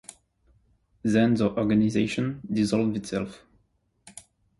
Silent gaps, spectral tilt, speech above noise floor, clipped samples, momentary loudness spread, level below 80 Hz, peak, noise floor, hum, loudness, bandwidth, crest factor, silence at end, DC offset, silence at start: none; -6.5 dB/octave; 45 dB; under 0.1%; 24 LU; -56 dBFS; -10 dBFS; -69 dBFS; none; -25 LUFS; 11.5 kHz; 18 dB; 0.4 s; under 0.1%; 1.05 s